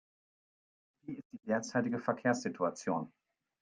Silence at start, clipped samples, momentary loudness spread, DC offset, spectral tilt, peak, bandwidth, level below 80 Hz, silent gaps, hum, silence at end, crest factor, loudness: 1.05 s; under 0.1%; 14 LU; under 0.1%; -5.5 dB/octave; -16 dBFS; 9.8 kHz; -80 dBFS; 1.25-1.30 s; none; 0.55 s; 22 dB; -35 LUFS